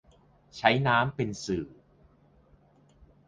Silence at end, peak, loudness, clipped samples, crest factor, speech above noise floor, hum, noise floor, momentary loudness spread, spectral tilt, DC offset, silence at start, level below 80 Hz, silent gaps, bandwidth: 1.6 s; -4 dBFS; -27 LUFS; under 0.1%; 26 dB; 34 dB; none; -61 dBFS; 17 LU; -5.5 dB/octave; under 0.1%; 0.55 s; -58 dBFS; none; 9.6 kHz